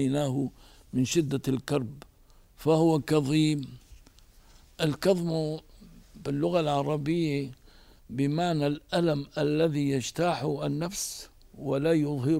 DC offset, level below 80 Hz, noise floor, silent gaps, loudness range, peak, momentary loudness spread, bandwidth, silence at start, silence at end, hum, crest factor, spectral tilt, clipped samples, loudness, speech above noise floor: under 0.1%; -56 dBFS; -57 dBFS; none; 3 LU; -12 dBFS; 10 LU; 16 kHz; 0 s; 0 s; none; 18 dB; -6 dB/octave; under 0.1%; -28 LUFS; 30 dB